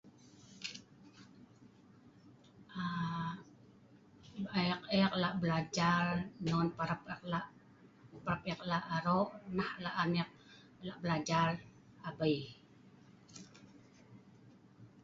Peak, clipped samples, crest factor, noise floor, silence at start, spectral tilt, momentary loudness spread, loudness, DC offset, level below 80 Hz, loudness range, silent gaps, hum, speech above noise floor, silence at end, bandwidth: -18 dBFS; under 0.1%; 22 dB; -62 dBFS; 0.05 s; -4.5 dB/octave; 20 LU; -37 LUFS; under 0.1%; -68 dBFS; 10 LU; none; none; 27 dB; 0.05 s; 7.6 kHz